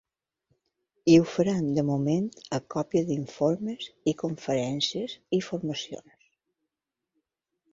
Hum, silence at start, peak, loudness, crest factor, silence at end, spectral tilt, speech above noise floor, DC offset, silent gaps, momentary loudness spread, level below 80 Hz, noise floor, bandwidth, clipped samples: none; 1.05 s; -6 dBFS; -27 LUFS; 22 dB; 1.7 s; -6 dB/octave; 60 dB; under 0.1%; none; 13 LU; -66 dBFS; -87 dBFS; 7.8 kHz; under 0.1%